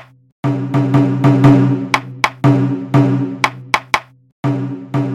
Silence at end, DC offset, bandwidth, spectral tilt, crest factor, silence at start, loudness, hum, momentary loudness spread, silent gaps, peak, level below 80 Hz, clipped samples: 0 s; under 0.1%; 12.5 kHz; -7 dB/octave; 14 dB; 0.45 s; -15 LUFS; none; 10 LU; 4.32-4.43 s; 0 dBFS; -48 dBFS; under 0.1%